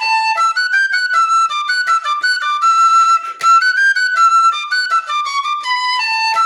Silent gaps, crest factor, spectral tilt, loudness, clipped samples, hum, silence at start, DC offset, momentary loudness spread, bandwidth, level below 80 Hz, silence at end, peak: none; 10 dB; 4 dB/octave; -13 LUFS; under 0.1%; none; 0 s; under 0.1%; 7 LU; 13 kHz; -82 dBFS; 0 s; -4 dBFS